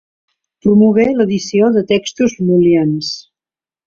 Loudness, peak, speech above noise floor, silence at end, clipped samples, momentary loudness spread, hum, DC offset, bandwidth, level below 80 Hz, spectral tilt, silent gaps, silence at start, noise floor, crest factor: -13 LUFS; -2 dBFS; over 78 dB; 0.65 s; under 0.1%; 9 LU; none; under 0.1%; 7.6 kHz; -50 dBFS; -6.5 dB/octave; none; 0.65 s; under -90 dBFS; 12 dB